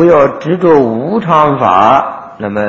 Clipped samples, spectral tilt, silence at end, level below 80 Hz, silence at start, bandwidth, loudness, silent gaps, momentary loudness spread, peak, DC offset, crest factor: 0.8%; -8 dB/octave; 0 s; -44 dBFS; 0 s; 7.6 kHz; -9 LUFS; none; 10 LU; 0 dBFS; under 0.1%; 10 dB